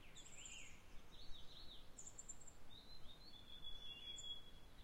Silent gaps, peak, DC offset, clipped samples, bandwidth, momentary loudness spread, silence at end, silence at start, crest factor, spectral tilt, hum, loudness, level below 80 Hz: none; -38 dBFS; under 0.1%; under 0.1%; 16 kHz; 11 LU; 0 s; 0 s; 16 dB; -1.5 dB/octave; none; -57 LUFS; -64 dBFS